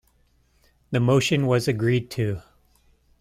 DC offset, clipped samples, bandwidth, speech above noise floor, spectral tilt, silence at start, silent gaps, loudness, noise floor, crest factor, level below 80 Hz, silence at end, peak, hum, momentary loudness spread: under 0.1%; under 0.1%; 15.5 kHz; 41 dB; -6 dB/octave; 0.9 s; none; -23 LUFS; -63 dBFS; 16 dB; -54 dBFS; 0.8 s; -8 dBFS; none; 9 LU